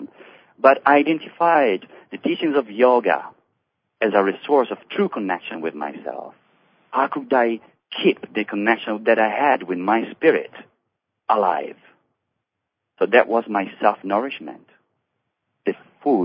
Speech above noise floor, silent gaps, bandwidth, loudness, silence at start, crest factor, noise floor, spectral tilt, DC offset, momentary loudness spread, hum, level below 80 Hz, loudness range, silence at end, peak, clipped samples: 61 dB; none; 5.2 kHz; -20 LUFS; 0 s; 22 dB; -80 dBFS; -9 dB/octave; under 0.1%; 14 LU; none; -76 dBFS; 5 LU; 0 s; 0 dBFS; under 0.1%